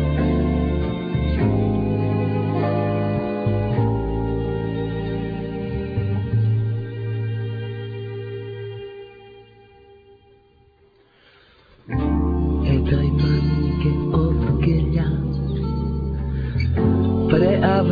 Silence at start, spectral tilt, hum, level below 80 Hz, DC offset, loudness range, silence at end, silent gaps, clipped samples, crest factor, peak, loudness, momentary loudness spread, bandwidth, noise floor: 0 s; -11 dB/octave; none; -30 dBFS; under 0.1%; 13 LU; 0 s; none; under 0.1%; 18 dB; -2 dBFS; -22 LUFS; 10 LU; 5 kHz; -56 dBFS